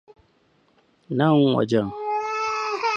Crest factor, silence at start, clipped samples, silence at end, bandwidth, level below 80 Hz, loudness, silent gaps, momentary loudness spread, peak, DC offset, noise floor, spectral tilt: 18 dB; 1.1 s; under 0.1%; 0 s; 8.4 kHz; -62 dBFS; -22 LUFS; none; 8 LU; -6 dBFS; under 0.1%; -62 dBFS; -6.5 dB/octave